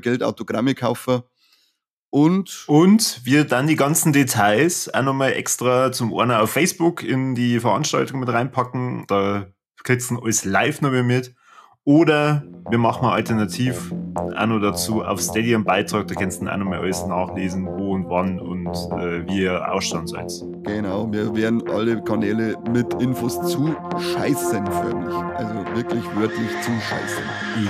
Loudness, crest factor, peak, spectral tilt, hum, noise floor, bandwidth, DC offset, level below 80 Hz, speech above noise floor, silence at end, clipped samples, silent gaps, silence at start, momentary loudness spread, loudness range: -21 LUFS; 16 dB; -4 dBFS; -5 dB/octave; none; -69 dBFS; 14.5 kHz; under 0.1%; -54 dBFS; 49 dB; 0 s; under 0.1%; 1.90-2.12 s; 0.05 s; 9 LU; 6 LU